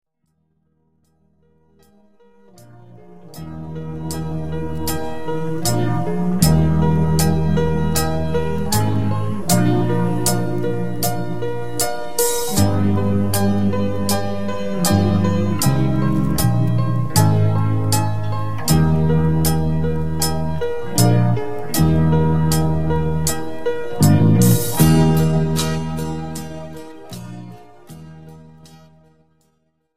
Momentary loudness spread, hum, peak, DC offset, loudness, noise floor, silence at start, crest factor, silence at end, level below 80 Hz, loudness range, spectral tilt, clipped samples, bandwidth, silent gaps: 12 LU; none; 0 dBFS; 7%; -18 LUFS; -68 dBFS; 0 s; 18 dB; 0 s; -34 dBFS; 12 LU; -6 dB/octave; under 0.1%; 16 kHz; none